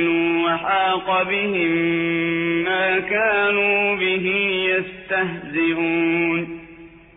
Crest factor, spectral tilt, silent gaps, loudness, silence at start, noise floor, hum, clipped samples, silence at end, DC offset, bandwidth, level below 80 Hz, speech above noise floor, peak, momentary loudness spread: 12 dB; -8.5 dB/octave; none; -19 LUFS; 0 s; -43 dBFS; none; under 0.1%; 0.2 s; under 0.1%; 3.9 kHz; -56 dBFS; 23 dB; -8 dBFS; 5 LU